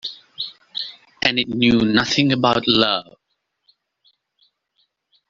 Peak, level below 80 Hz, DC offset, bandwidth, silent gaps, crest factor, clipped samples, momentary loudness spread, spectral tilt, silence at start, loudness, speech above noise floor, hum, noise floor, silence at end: 0 dBFS; -52 dBFS; under 0.1%; 7.6 kHz; none; 20 dB; under 0.1%; 14 LU; -4.5 dB/octave; 0.05 s; -18 LUFS; 51 dB; none; -68 dBFS; 2.3 s